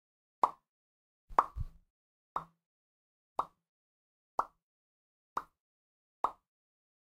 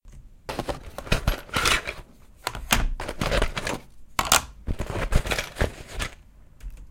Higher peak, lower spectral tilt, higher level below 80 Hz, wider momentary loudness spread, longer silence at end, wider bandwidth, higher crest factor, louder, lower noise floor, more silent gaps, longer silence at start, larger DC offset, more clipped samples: second, -12 dBFS vs -2 dBFS; first, -5.5 dB/octave vs -3 dB/octave; second, -56 dBFS vs -32 dBFS; about the same, 15 LU vs 15 LU; first, 0.7 s vs 0 s; about the same, 15.5 kHz vs 17 kHz; first, 30 dB vs 24 dB; second, -38 LUFS vs -27 LUFS; first, under -90 dBFS vs -48 dBFS; first, 0.69-1.28 s, 1.90-2.35 s, 2.66-3.36 s, 3.69-4.38 s, 4.62-5.36 s, 5.60-6.24 s vs none; first, 0.45 s vs 0.05 s; neither; neither